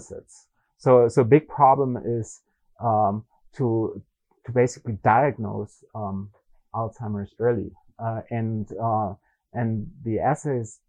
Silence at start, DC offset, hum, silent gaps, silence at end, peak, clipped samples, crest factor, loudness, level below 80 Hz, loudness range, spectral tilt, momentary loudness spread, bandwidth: 0 s; under 0.1%; none; none; 0.15 s; -4 dBFS; under 0.1%; 20 dB; -24 LUFS; -58 dBFS; 7 LU; -8 dB/octave; 17 LU; 10 kHz